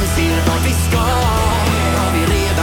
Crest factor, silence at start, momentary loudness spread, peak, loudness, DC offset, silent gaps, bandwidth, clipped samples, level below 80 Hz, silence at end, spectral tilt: 12 dB; 0 s; 1 LU; -2 dBFS; -15 LUFS; under 0.1%; none; 17.5 kHz; under 0.1%; -22 dBFS; 0 s; -5 dB/octave